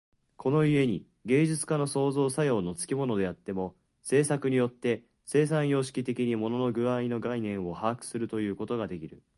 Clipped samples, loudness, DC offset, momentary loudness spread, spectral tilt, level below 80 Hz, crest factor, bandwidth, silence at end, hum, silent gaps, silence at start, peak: under 0.1%; -29 LUFS; under 0.1%; 9 LU; -6 dB/octave; -62 dBFS; 18 dB; 11.5 kHz; 0.2 s; none; none; 0.4 s; -10 dBFS